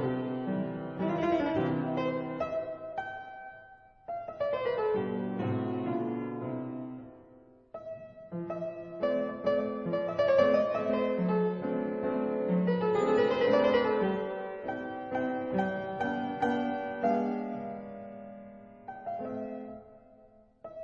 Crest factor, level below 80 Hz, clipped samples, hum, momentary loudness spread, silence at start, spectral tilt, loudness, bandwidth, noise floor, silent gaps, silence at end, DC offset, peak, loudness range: 20 dB; -64 dBFS; under 0.1%; none; 19 LU; 0 s; -8 dB/octave; -31 LUFS; 7.4 kHz; -59 dBFS; none; 0 s; under 0.1%; -12 dBFS; 8 LU